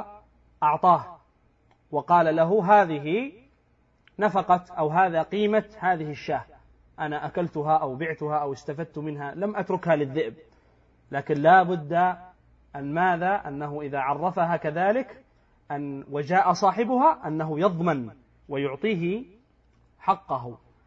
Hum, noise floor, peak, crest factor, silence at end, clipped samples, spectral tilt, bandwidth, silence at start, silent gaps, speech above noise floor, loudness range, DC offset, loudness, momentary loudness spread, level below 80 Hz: none; -64 dBFS; -6 dBFS; 20 dB; 0.3 s; under 0.1%; -7 dB/octave; 7.6 kHz; 0 s; none; 40 dB; 5 LU; under 0.1%; -25 LUFS; 13 LU; -62 dBFS